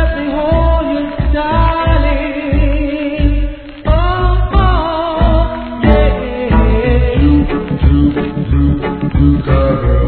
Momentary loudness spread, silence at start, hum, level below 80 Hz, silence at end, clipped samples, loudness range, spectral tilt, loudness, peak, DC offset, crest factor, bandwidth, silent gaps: 5 LU; 0 s; none; -14 dBFS; 0 s; under 0.1%; 2 LU; -11.5 dB/octave; -13 LUFS; 0 dBFS; 0.3%; 12 dB; 4.5 kHz; none